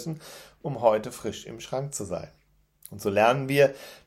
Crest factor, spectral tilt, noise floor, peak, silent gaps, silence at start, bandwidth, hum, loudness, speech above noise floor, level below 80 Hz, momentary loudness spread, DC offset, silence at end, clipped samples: 20 dB; -5 dB/octave; -54 dBFS; -6 dBFS; none; 0 s; 16 kHz; none; -26 LUFS; 27 dB; -62 dBFS; 17 LU; under 0.1%; 0.1 s; under 0.1%